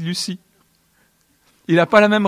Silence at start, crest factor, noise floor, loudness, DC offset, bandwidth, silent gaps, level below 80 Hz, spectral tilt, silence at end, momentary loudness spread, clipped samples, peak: 0 s; 18 dB; -60 dBFS; -17 LUFS; under 0.1%; 15 kHz; none; -62 dBFS; -5 dB/octave; 0 s; 22 LU; under 0.1%; 0 dBFS